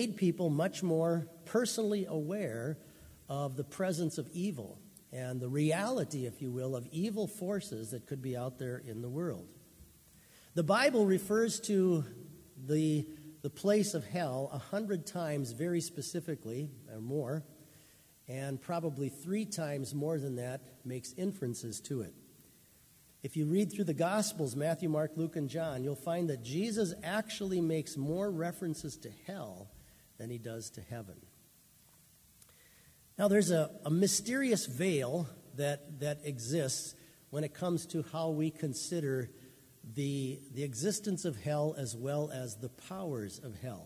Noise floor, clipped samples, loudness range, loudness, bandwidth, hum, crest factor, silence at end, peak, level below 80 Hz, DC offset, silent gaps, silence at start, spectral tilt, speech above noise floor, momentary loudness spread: -64 dBFS; under 0.1%; 8 LU; -36 LUFS; 16 kHz; none; 20 dB; 0 s; -16 dBFS; -70 dBFS; under 0.1%; none; 0 s; -5.5 dB/octave; 29 dB; 14 LU